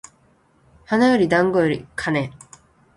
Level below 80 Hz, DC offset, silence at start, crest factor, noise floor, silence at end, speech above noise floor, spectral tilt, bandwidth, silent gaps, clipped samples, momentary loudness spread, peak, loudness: -54 dBFS; under 0.1%; 0.9 s; 18 dB; -58 dBFS; 0.65 s; 40 dB; -6 dB/octave; 11.5 kHz; none; under 0.1%; 9 LU; -4 dBFS; -19 LUFS